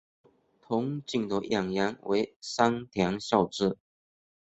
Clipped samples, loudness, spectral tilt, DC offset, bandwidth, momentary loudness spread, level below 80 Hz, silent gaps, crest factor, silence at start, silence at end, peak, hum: under 0.1%; -29 LUFS; -5.5 dB/octave; under 0.1%; 8.2 kHz; 5 LU; -62 dBFS; 2.36-2.40 s; 24 dB; 0.7 s; 0.65 s; -6 dBFS; none